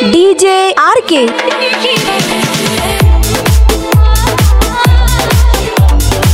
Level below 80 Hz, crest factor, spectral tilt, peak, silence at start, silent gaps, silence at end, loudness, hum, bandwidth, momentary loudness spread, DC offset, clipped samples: -12 dBFS; 8 dB; -4.5 dB/octave; 0 dBFS; 0 s; none; 0 s; -9 LUFS; none; 16.5 kHz; 4 LU; under 0.1%; 0.2%